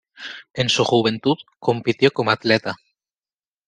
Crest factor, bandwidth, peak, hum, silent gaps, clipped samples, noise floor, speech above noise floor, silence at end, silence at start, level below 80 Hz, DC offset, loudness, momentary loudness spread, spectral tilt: 20 dB; 9.8 kHz; -2 dBFS; none; none; under 0.1%; under -90 dBFS; over 71 dB; 0.9 s; 0.2 s; -60 dBFS; under 0.1%; -19 LUFS; 16 LU; -4.5 dB/octave